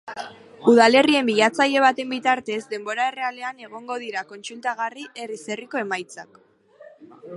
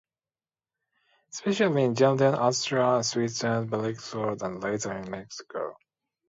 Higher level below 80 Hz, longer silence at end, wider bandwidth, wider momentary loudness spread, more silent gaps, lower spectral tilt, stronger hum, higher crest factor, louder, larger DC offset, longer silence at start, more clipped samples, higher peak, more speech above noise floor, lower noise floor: about the same, -72 dBFS vs -68 dBFS; second, 0 s vs 0.55 s; first, 11.5 kHz vs 8 kHz; first, 20 LU vs 14 LU; neither; second, -3.5 dB/octave vs -5 dB/octave; neither; about the same, 22 dB vs 20 dB; first, -21 LUFS vs -27 LUFS; neither; second, 0.05 s vs 1.35 s; neither; first, -2 dBFS vs -8 dBFS; second, 27 dB vs over 64 dB; second, -49 dBFS vs under -90 dBFS